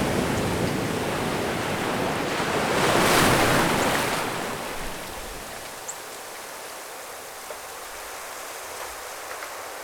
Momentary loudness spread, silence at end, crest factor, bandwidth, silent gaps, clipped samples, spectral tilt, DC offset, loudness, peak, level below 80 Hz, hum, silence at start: 17 LU; 0 s; 22 dB; over 20 kHz; none; under 0.1%; -3.5 dB/octave; under 0.1%; -26 LUFS; -4 dBFS; -46 dBFS; none; 0 s